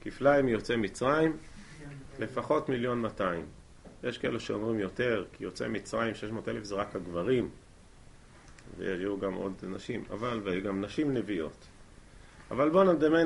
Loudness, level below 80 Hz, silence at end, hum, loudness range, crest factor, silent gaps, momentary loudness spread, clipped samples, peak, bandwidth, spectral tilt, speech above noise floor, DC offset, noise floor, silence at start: -31 LUFS; -54 dBFS; 0 s; none; 5 LU; 20 dB; none; 14 LU; under 0.1%; -12 dBFS; 11.5 kHz; -6.5 dB/octave; 24 dB; under 0.1%; -54 dBFS; 0.05 s